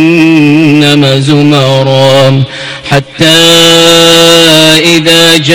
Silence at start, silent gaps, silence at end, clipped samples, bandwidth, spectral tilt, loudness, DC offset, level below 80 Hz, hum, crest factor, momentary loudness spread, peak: 0 s; none; 0 s; 10%; over 20 kHz; -4 dB/octave; -3 LUFS; 2%; -38 dBFS; none; 4 dB; 9 LU; 0 dBFS